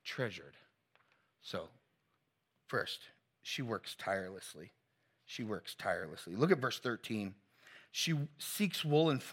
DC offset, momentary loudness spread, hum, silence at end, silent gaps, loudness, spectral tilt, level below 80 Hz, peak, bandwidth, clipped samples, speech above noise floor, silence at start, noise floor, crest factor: under 0.1%; 17 LU; none; 0 s; none; -38 LUFS; -4.5 dB/octave; -82 dBFS; -14 dBFS; 16.5 kHz; under 0.1%; 44 dB; 0.05 s; -82 dBFS; 26 dB